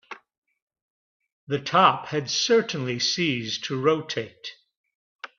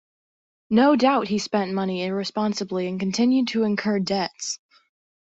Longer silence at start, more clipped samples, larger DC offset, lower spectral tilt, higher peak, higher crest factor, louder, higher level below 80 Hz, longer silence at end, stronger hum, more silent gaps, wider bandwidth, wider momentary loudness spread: second, 0.1 s vs 0.7 s; neither; neither; second, -3.5 dB/octave vs -5 dB/octave; about the same, -4 dBFS vs -6 dBFS; first, 24 dB vs 16 dB; about the same, -23 LUFS vs -23 LUFS; about the same, -68 dBFS vs -64 dBFS; second, 0.1 s vs 0.8 s; neither; first, 0.38-0.42 s, 0.62-0.67 s, 0.82-1.20 s, 1.32-1.47 s, 4.77-4.84 s, 4.95-5.19 s vs none; second, 7.4 kHz vs 8.2 kHz; first, 21 LU vs 9 LU